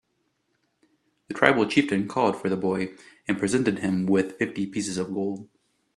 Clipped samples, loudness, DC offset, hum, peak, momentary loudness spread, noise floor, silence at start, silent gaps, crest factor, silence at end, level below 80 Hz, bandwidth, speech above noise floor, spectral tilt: under 0.1%; -25 LUFS; under 0.1%; none; 0 dBFS; 10 LU; -73 dBFS; 1.3 s; none; 26 dB; 0.5 s; -64 dBFS; 12 kHz; 49 dB; -5.5 dB/octave